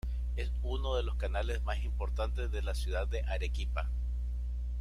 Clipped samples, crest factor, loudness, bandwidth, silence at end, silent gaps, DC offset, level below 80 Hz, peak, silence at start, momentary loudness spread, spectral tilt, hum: under 0.1%; 14 dB; -36 LUFS; 11.5 kHz; 0 s; none; under 0.1%; -34 dBFS; -20 dBFS; 0.05 s; 3 LU; -6 dB/octave; 60 Hz at -35 dBFS